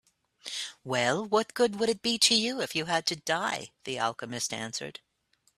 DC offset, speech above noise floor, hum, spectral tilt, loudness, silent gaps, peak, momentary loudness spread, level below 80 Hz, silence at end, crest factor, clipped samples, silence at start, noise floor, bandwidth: under 0.1%; 42 dB; none; -2.5 dB/octave; -28 LUFS; none; -10 dBFS; 14 LU; -72 dBFS; 0.65 s; 20 dB; under 0.1%; 0.45 s; -71 dBFS; 14.5 kHz